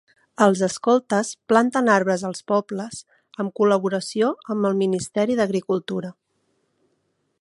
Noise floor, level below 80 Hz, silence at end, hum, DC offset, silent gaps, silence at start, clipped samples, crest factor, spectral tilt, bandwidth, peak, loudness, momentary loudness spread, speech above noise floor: -71 dBFS; -66 dBFS; 1.3 s; none; under 0.1%; none; 0.4 s; under 0.1%; 20 dB; -5.5 dB/octave; 11.5 kHz; -2 dBFS; -22 LUFS; 12 LU; 50 dB